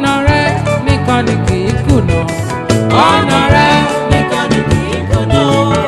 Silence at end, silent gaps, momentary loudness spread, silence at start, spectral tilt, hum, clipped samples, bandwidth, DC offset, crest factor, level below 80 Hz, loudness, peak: 0 s; none; 6 LU; 0 s; -6 dB/octave; none; 0.6%; 13 kHz; under 0.1%; 10 dB; -26 dBFS; -11 LUFS; 0 dBFS